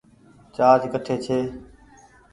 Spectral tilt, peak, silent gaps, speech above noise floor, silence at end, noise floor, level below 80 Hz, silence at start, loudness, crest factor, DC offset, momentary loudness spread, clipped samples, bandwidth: -6.5 dB/octave; -2 dBFS; none; 32 dB; 0.7 s; -52 dBFS; -56 dBFS; 0.6 s; -21 LUFS; 22 dB; under 0.1%; 19 LU; under 0.1%; 11 kHz